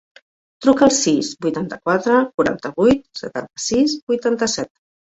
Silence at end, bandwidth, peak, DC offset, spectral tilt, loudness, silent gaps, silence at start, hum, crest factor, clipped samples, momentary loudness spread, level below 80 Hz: 0.45 s; 8.2 kHz; -2 dBFS; under 0.1%; -4 dB/octave; -18 LUFS; 2.34-2.38 s, 4.02-4.07 s; 0.6 s; none; 18 dB; under 0.1%; 11 LU; -50 dBFS